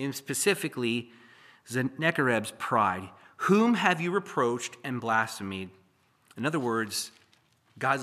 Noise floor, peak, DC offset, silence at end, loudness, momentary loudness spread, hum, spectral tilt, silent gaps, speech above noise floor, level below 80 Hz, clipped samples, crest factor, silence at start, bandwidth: -66 dBFS; -6 dBFS; under 0.1%; 0 s; -28 LUFS; 13 LU; none; -4.5 dB/octave; none; 38 dB; -78 dBFS; under 0.1%; 22 dB; 0 s; 15 kHz